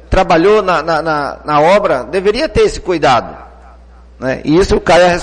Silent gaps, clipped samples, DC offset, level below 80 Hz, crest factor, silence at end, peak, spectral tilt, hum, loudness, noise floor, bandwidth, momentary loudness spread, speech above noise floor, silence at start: none; under 0.1%; under 0.1%; -28 dBFS; 12 dB; 0 s; 0 dBFS; -5 dB/octave; 60 Hz at -40 dBFS; -12 LUFS; -38 dBFS; 10 kHz; 8 LU; 27 dB; 0.1 s